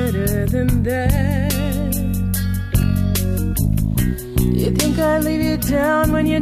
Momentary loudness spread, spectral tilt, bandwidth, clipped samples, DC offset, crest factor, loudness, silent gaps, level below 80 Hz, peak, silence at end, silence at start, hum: 4 LU; -6 dB/octave; 14.5 kHz; under 0.1%; under 0.1%; 14 dB; -19 LUFS; none; -26 dBFS; -4 dBFS; 0 s; 0 s; none